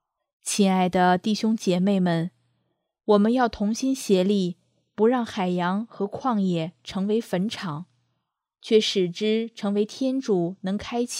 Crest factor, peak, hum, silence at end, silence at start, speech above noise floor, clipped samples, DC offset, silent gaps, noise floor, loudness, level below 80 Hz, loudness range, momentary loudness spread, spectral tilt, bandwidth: 18 dB; -6 dBFS; none; 0 s; 0.45 s; 56 dB; under 0.1%; under 0.1%; none; -79 dBFS; -24 LUFS; -60 dBFS; 3 LU; 11 LU; -5.5 dB/octave; 15 kHz